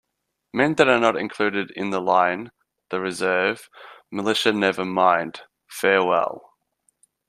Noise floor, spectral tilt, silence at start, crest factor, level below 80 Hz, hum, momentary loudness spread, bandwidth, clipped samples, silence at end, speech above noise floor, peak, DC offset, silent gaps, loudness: -78 dBFS; -4.5 dB/octave; 0.55 s; 20 dB; -66 dBFS; none; 16 LU; 15 kHz; under 0.1%; 0.9 s; 57 dB; -2 dBFS; under 0.1%; none; -21 LUFS